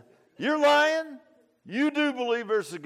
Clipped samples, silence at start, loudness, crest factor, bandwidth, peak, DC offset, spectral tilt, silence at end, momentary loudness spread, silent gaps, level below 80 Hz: under 0.1%; 0.4 s; -25 LUFS; 16 dB; 14.5 kHz; -10 dBFS; under 0.1%; -3.5 dB/octave; 0 s; 12 LU; none; -82 dBFS